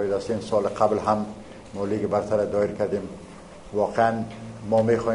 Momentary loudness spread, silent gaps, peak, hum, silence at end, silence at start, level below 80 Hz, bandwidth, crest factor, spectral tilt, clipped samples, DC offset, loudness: 17 LU; none; -6 dBFS; none; 0 s; 0 s; -52 dBFS; 10.5 kHz; 18 dB; -7 dB/octave; under 0.1%; under 0.1%; -25 LUFS